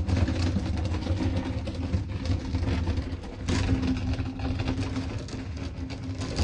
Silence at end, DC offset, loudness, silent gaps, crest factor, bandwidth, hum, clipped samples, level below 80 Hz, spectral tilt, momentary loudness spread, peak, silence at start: 0 s; under 0.1%; -30 LUFS; none; 16 dB; 9.8 kHz; none; under 0.1%; -36 dBFS; -6.5 dB/octave; 8 LU; -12 dBFS; 0 s